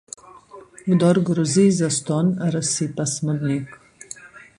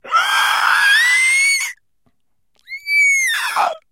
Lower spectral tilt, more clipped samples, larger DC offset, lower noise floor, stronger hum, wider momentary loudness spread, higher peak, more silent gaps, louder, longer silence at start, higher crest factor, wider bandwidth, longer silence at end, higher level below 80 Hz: first, -5.5 dB/octave vs 4 dB/octave; neither; neither; second, -44 dBFS vs -69 dBFS; neither; first, 21 LU vs 10 LU; about the same, -4 dBFS vs -2 dBFS; neither; second, -20 LUFS vs -13 LUFS; first, 0.25 s vs 0.05 s; about the same, 18 dB vs 14 dB; second, 11.5 kHz vs 16 kHz; about the same, 0.2 s vs 0.15 s; first, -58 dBFS vs -70 dBFS